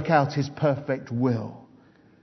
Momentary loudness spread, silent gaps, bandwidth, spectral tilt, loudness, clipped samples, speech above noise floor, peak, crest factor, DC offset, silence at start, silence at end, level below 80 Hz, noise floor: 8 LU; none; 6.2 kHz; -7.5 dB/octave; -26 LUFS; under 0.1%; 31 dB; -6 dBFS; 20 dB; under 0.1%; 0 s; 0.6 s; -66 dBFS; -55 dBFS